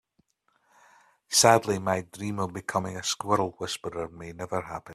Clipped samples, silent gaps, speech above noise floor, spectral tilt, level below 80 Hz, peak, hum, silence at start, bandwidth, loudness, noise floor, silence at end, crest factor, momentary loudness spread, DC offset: under 0.1%; none; 43 dB; -3 dB/octave; -62 dBFS; -2 dBFS; none; 1.3 s; 15 kHz; -27 LUFS; -71 dBFS; 0 s; 26 dB; 15 LU; under 0.1%